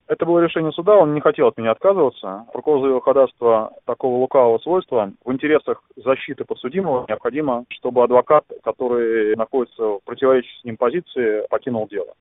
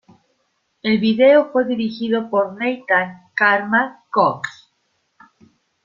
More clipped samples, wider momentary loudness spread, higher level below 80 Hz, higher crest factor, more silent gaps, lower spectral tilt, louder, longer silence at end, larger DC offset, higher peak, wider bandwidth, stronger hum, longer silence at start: neither; about the same, 9 LU vs 11 LU; about the same, -62 dBFS vs -64 dBFS; about the same, 18 dB vs 18 dB; neither; first, -11 dB/octave vs -6.5 dB/octave; about the same, -19 LUFS vs -18 LUFS; second, 0.15 s vs 1.35 s; neither; about the same, 0 dBFS vs -2 dBFS; second, 3.9 kHz vs 7.4 kHz; neither; second, 0.1 s vs 0.85 s